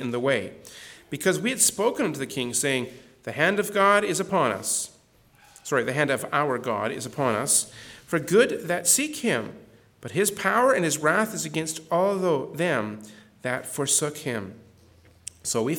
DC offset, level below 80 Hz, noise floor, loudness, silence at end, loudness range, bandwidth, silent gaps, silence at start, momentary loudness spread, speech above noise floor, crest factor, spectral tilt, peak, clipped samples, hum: under 0.1%; -66 dBFS; -58 dBFS; -24 LUFS; 0 s; 3 LU; 19 kHz; none; 0 s; 17 LU; 33 dB; 20 dB; -3 dB/octave; -6 dBFS; under 0.1%; none